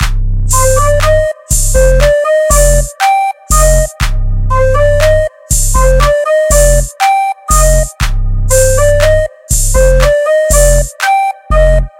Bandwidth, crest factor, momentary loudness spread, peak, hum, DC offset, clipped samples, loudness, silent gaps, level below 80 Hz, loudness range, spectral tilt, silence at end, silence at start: 17 kHz; 8 dB; 6 LU; 0 dBFS; none; under 0.1%; 0.6%; -10 LUFS; none; -12 dBFS; 1 LU; -3.5 dB/octave; 0.1 s; 0 s